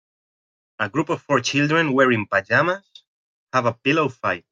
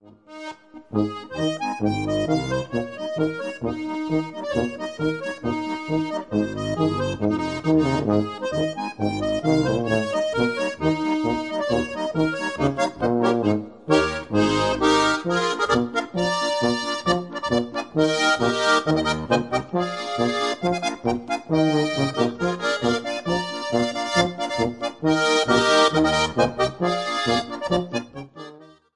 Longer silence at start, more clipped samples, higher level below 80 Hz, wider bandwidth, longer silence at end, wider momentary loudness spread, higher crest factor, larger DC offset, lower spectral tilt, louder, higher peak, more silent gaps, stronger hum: first, 0.8 s vs 0.05 s; neither; second, -66 dBFS vs -50 dBFS; second, 9 kHz vs 11.5 kHz; second, 0.15 s vs 0.3 s; about the same, 7 LU vs 8 LU; about the same, 18 dB vs 18 dB; second, under 0.1% vs 0.1%; about the same, -5 dB/octave vs -5 dB/octave; first, -20 LUFS vs -23 LUFS; about the same, -4 dBFS vs -4 dBFS; first, 3.07-3.47 s vs none; neither